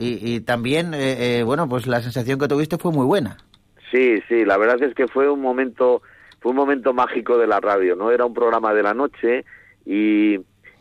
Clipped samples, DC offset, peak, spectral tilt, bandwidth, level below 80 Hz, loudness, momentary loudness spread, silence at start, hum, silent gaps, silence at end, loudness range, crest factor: under 0.1%; under 0.1%; -8 dBFS; -6.5 dB/octave; 15.5 kHz; -58 dBFS; -19 LUFS; 6 LU; 0 s; none; none; 0.4 s; 2 LU; 12 dB